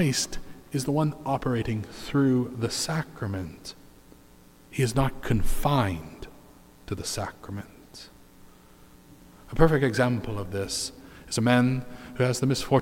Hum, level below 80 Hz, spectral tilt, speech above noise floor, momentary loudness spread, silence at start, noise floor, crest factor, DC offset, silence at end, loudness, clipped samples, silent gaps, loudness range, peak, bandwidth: none; -40 dBFS; -5.5 dB/octave; 28 dB; 20 LU; 0 s; -53 dBFS; 22 dB; under 0.1%; 0 s; -27 LUFS; under 0.1%; none; 6 LU; -6 dBFS; 16.5 kHz